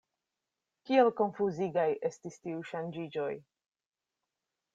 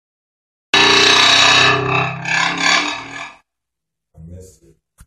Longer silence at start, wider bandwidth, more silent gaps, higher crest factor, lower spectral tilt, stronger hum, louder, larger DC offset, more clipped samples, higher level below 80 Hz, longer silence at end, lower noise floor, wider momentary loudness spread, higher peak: about the same, 0.85 s vs 0.75 s; second, 7.8 kHz vs 14 kHz; neither; first, 22 dB vs 16 dB; first, -6.5 dB/octave vs -1.5 dB/octave; neither; second, -32 LUFS vs -11 LUFS; neither; neither; second, -78 dBFS vs -50 dBFS; first, 1.35 s vs 0.6 s; first, -89 dBFS vs -82 dBFS; about the same, 14 LU vs 15 LU; second, -14 dBFS vs 0 dBFS